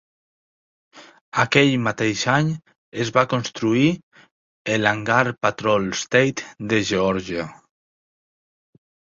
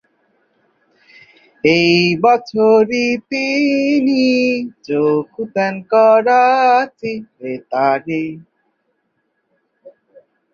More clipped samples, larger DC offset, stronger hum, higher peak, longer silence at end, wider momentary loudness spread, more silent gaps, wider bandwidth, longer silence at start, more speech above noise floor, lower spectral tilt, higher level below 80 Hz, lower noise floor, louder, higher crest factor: neither; neither; neither; about the same, -2 dBFS vs -2 dBFS; first, 1.6 s vs 0.65 s; about the same, 11 LU vs 12 LU; first, 1.21-1.32 s, 2.78-2.92 s, 4.03-4.11 s, 4.31-4.65 s vs none; about the same, 7.8 kHz vs 7.2 kHz; second, 0.95 s vs 1.65 s; first, over 70 dB vs 54 dB; about the same, -5 dB/octave vs -5.5 dB/octave; first, -56 dBFS vs -62 dBFS; first, under -90 dBFS vs -68 dBFS; second, -20 LUFS vs -15 LUFS; first, 22 dB vs 16 dB